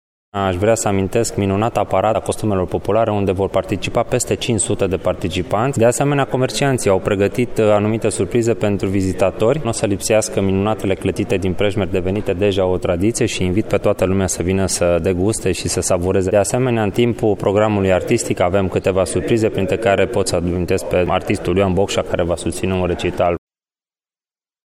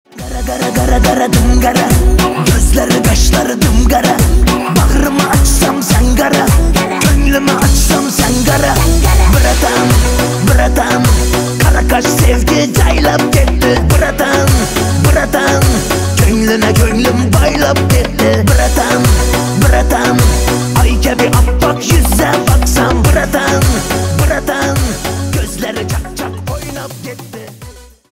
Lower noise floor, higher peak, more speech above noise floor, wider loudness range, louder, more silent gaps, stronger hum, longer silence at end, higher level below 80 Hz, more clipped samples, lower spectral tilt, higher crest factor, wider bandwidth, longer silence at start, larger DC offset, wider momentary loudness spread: first, under -90 dBFS vs -33 dBFS; about the same, -2 dBFS vs 0 dBFS; first, over 73 dB vs 24 dB; about the same, 2 LU vs 2 LU; second, -17 LUFS vs -11 LUFS; neither; neither; first, 1.3 s vs 0.3 s; second, -38 dBFS vs -14 dBFS; neither; about the same, -5.5 dB/octave vs -5 dB/octave; about the same, 14 dB vs 10 dB; about the same, 15.5 kHz vs 16.5 kHz; first, 0.35 s vs 0.15 s; neither; second, 4 LU vs 7 LU